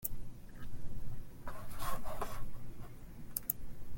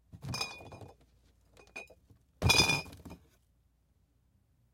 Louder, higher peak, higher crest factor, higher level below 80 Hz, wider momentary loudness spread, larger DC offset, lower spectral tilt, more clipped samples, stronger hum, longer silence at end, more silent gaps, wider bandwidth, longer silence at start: second, -45 LUFS vs -29 LUFS; second, -14 dBFS vs -10 dBFS; about the same, 22 dB vs 26 dB; first, -48 dBFS vs -54 dBFS; second, 14 LU vs 27 LU; neither; first, -4 dB/octave vs -2.5 dB/octave; neither; neither; second, 0 s vs 1.6 s; neither; about the same, 17 kHz vs 16.5 kHz; second, 0 s vs 0.15 s